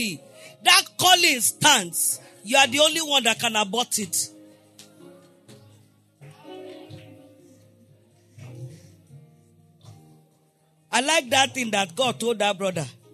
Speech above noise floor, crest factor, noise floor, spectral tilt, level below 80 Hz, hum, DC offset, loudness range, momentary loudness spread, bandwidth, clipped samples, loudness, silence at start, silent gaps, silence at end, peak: 41 dB; 22 dB; -63 dBFS; -1 dB/octave; -74 dBFS; none; under 0.1%; 13 LU; 25 LU; 13.5 kHz; under 0.1%; -20 LUFS; 0 s; none; 0.2 s; -2 dBFS